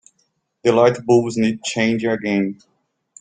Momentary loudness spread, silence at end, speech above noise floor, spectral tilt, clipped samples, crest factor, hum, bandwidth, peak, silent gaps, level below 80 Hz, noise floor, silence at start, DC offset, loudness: 7 LU; 0.7 s; 50 dB; -5.5 dB/octave; under 0.1%; 18 dB; none; 9.4 kHz; -2 dBFS; none; -60 dBFS; -68 dBFS; 0.65 s; under 0.1%; -18 LUFS